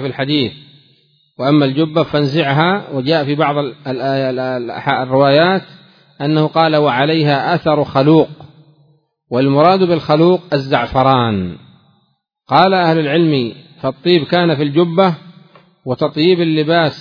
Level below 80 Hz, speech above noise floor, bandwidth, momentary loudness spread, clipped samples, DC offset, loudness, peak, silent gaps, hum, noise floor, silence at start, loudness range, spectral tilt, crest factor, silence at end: -50 dBFS; 49 dB; 5.4 kHz; 9 LU; under 0.1%; under 0.1%; -14 LUFS; 0 dBFS; none; none; -62 dBFS; 0 s; 2 LU; -8.5 dB/octave; 14 dB; 0 s